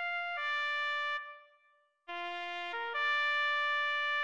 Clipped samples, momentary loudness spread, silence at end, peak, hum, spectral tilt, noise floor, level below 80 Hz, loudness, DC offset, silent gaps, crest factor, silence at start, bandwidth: under 0.1%; 10 LU; 0 s; -22 dBFS; none; 0.5 dB/octave; -71 dBFS; -84 dBFS; -33 LUFS; under 0.1%; none; 14 dB; 0 s; 9.4 kHz